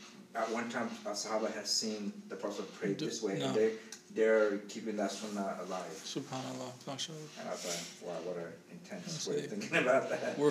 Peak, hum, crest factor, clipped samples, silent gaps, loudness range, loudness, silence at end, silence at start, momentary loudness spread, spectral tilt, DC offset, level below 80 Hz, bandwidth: -16 dBFS; none; 20 dB; under 0.1%; none; 7 LU; -36 LUFS; 0 s; 0 s; 12 LU; -3.5 dB/octave; under 0.1%; -88 dBFS; 15.5 kHz